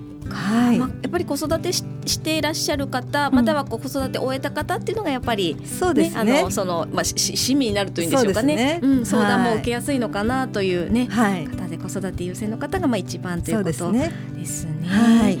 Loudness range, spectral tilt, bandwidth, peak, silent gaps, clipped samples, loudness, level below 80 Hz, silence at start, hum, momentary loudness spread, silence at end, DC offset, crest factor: 4 LU; -4.5 dB/octave; 18 kHz; -6 dBFS; none; under 0.1%; -21 LUFS; -44 dBFS; 0 s; none; 9 LU; 0 s; under 0.1%; 14 dB